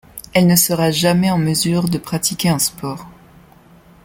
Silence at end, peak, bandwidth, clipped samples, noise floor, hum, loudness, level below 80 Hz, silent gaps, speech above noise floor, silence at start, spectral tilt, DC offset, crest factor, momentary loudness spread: 0.95 s; 0 dBFS; 17 kHz; under 0.1%; -46 dBFS; none; -16 LUFS; -48 dBFS; none; 30 dB; 0.15 s; -4.5 dB/octave; under 0.1%; 18 dB; 8 LU